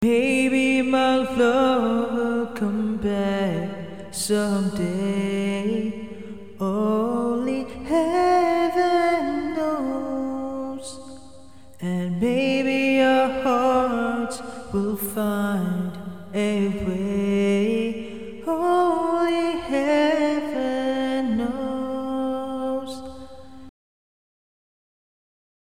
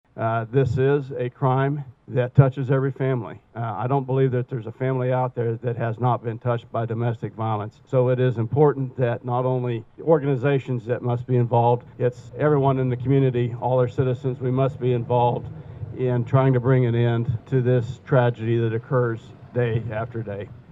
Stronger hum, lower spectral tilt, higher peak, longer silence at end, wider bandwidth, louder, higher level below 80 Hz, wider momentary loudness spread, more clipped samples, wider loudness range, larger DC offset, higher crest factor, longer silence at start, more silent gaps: neither; second, -5.5 dB/octave vs -10 dB/octave; second, -8 dBFS vs -2 dBFS; first, 2 s vs 0.1 s; first, 17 kHz vs 4 kHz; about the same, -23 LUFS vs -23 LUFS; about the same, -52 dBFS vs -56 dBFS; first, 12 LU vs 9 LU; neither; about the same, 5 LU vs 3 LU; first, 0.7% vs under 0.1%; about the same, 16 dB vs 20 dB; second, 0 s vs 0.15 s; neither